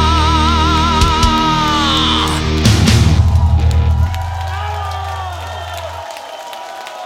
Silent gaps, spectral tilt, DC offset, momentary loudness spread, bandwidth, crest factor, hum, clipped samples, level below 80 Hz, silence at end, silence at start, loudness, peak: none; -5 dB/octave; under 0.1%; 16 LU; 14.5 kHz; 14 dB; none; under 0.1%; -20 dBFS; 0 s; 0 s; -13 LUFS; 0 dBFS